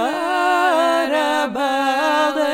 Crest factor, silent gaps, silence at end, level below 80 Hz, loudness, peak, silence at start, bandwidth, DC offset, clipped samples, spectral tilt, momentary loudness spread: 12 dB; none; 0 s; -64 dBFS; -17 LUFS; -6 dBFS; 0 s; 17 kHz; under 0.1%; under 0.1%; -2.5 dB/octave; 4 LU